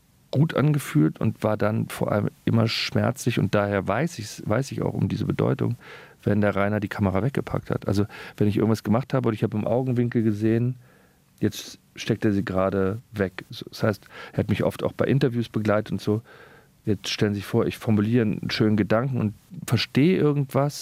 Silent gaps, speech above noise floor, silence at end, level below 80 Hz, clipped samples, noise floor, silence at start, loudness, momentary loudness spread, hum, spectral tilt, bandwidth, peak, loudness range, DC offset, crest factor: none; 33 dB; 0 s; -56 dBFS; under 0.1%; -57 dBFS; 0.35 s; -24 LUFS; 7 LU; none; -7 dB/octave; 16 kHz; -6 dBFS; 3 LU; under 0.1%; 18 dB